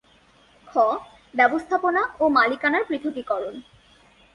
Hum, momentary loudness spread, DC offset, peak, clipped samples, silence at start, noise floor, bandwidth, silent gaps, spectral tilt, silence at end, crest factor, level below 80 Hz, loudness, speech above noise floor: none; 12 LU; under 0.1%; -4 dBFS; under 0.1%; 0.65 s; -56 dBFS; 11 kHz; none; -5 dB/octave; 0.75 s; 18 dB; -60 dBFS; -22 LUFS; 35 dB